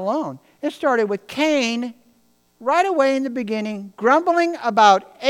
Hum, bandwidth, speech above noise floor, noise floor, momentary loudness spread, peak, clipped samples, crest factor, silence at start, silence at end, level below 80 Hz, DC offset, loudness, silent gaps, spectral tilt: 60 Hz at -70 dBFS; 16 kHz; 41 dB; -60 dBFS; 14 LU; 0 dBFS; under 0.1%; 20 dB; 0 s; 0 s; -74 dBFS; under 0.1%; -19 LUFS; none; -4 dB/octave